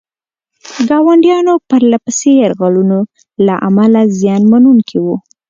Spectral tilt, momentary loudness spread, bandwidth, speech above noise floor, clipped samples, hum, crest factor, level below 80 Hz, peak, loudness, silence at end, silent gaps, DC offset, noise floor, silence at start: -6.5 dB/octave; 9 LU; 7.8 kHz; 75 dB; under 0.1%; none; 10 dB; -56 dBFS; 0 dBFS; -10 LUFS; 0.3 s; none; under 0.1%; -84 dBFS; 0.65 s